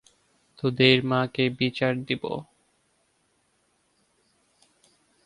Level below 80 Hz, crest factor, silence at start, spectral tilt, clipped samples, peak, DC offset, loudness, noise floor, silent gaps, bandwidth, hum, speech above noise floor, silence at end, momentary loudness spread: -62 dBFS; 24 dB; 0.65 s; -6.5 dB/octave; under 0.1%; -4 dBFS; under 0.1%; -24 LUFS; -69 dBFS; none; 11 kHz; none; 46 dB; 2.8 s; 11 LU